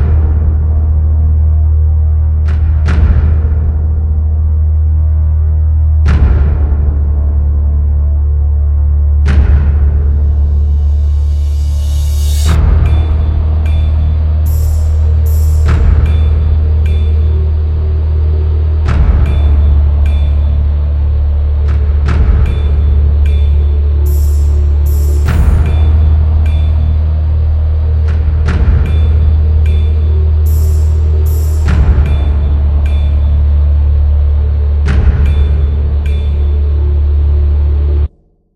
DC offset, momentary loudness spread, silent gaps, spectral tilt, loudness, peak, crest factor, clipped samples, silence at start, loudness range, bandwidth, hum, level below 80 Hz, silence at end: 0.5%; 3 LU; none; -8 dB/octave; -11 LUFS; 0 dBFS; 8 dB; under 0.1%; 0 s; 1 LU; 7.8 kHz; none; -10 dBFS; 0.5 s